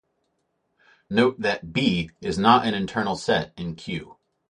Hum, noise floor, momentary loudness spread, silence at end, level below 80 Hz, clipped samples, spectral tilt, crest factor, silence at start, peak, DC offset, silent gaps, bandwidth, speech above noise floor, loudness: none; -73 dBFS; 15 LU; 0.35 s; -52 dBFS; under 0.1%; -5.5 dB/octave; 22 dB; 1.1 s; -4 dBFS; under 0.1%; none; 10.5 kHz; 50 dB; -23 LUFS